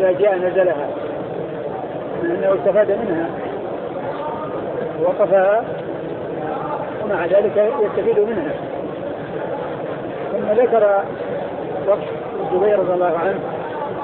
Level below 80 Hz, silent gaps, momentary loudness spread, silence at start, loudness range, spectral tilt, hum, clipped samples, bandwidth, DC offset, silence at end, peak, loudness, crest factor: -54 dBFS; none; 11 LU; 0 s; 2 LU; -11 dB/octave; none; under 0.1%; 4.2 kHz; under 0.1%; 0 s; -4 dBFS; -20 LUFS; 16 dB